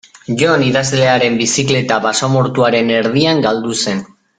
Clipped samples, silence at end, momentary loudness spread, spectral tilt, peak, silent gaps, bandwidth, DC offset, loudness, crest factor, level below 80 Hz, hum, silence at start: under 0.1%; 0.35 s; 5 LU; -4.5 dB/octave; 0 dBFS; none; 9.6 kHz; under 0.1%; -13 LUFS; 14 dB; -50 dBFS; none; 0.3 s